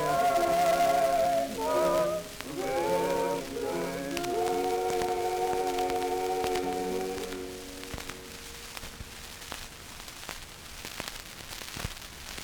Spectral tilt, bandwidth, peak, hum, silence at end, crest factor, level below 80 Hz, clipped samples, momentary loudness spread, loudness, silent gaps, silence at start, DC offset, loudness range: -3.5 dB/octave; over 20 kHz; -12 dBFS; none; 0 s; 20 dB; -52 dBFS; under 0.1%; 16 LU; -30 LUFS; none; 0 s; under 0.1%; 13 LU